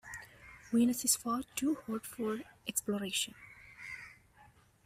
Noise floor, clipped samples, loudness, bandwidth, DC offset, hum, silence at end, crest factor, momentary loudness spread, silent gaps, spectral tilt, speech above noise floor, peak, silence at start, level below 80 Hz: -63 dBFS; under 0.1%; -34 LUFS; 16 kHz; under 0.1%; none; 0.4 s; 24 dB; 23 LU; none; -2.5 dB/octave; 29 dB; -12 dBFS; 0.05 s; -68 dBFS